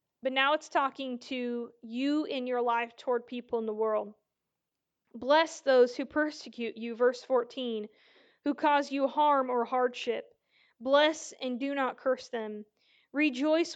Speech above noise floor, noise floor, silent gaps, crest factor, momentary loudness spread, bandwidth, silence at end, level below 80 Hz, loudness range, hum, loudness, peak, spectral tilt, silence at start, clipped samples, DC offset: 57 dB; -87 dBFS; none; 18 dB; 13 LU; 9 kHz; 0 s; -80 dBFS; 4 LU; none; -30 LUFS; -12 dBFS; -3 dB/octave; 0.25 s; under 0.1%; under 0.1%